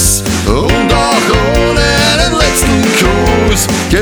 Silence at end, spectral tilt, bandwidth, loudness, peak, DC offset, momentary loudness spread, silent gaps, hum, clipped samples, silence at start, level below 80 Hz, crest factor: 0 s; -3.5 dB/octave; over 20 kHz; -10 LUFS; 0 dBFS; under 0.1%; 3 LU; none; none; under 0.1%; 0 s; -18 dBFS; 10 dB